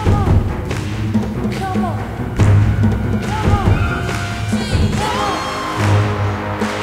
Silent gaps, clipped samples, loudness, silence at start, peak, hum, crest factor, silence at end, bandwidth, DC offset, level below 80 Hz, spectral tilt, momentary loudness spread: none; under 0.1%; -17 LUFS; 0 s; 0 dBFS; none; 16 dB; 0 s; 13.5 kHz; under 0.1%; -26 dBFS; -6.5 dB/octave; 7 LU